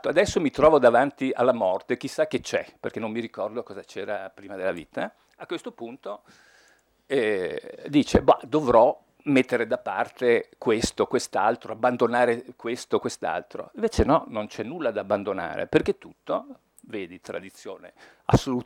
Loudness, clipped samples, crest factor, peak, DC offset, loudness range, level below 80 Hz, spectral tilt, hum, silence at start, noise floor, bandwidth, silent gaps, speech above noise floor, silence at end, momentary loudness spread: -25 LUFS; under 0.1%; 22 dB; -4 dBFS; under 0.1%; 10 LU; -48 dBFS; -5.5 dB/octave; none; 0.05 s; -61 dBFS; 15.5 kHz; none; 37 dB; 0.05 s; 16 LU